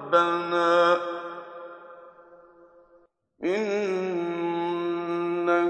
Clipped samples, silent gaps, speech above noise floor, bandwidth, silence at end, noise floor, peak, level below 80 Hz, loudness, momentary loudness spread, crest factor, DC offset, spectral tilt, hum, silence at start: under 0.1%; none; 39 dB; 8.6 kHz; 0 s; -61 dBFS; -6 dBFS; -78 dBFS; -25 LUFS; 21 LU; 20 dB; under 0.1%; -5.5 dB/octave; none; 0 s